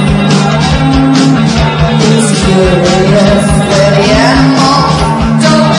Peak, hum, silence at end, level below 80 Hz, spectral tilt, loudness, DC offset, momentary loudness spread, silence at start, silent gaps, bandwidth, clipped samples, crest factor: 0 dBFS; none; 0 s; -22 dBFS; -5.5 dB/octave; -7 LUFS; under 0.1%; 3 LU; 0 s; none; 11 kHz; 1%; 6 dB